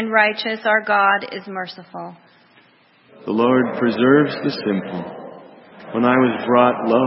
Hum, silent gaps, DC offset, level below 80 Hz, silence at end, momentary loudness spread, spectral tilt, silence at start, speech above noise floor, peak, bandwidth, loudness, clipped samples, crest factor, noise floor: none; none; under 0.1%; -66 dBFS; 0 s; 19 LU; -10 dB/octave; 0 s; 36 dB; 0 dBFS; 5.8 kHz; -18 LUFS; under 0.1%; 18 dB; -54 dBFS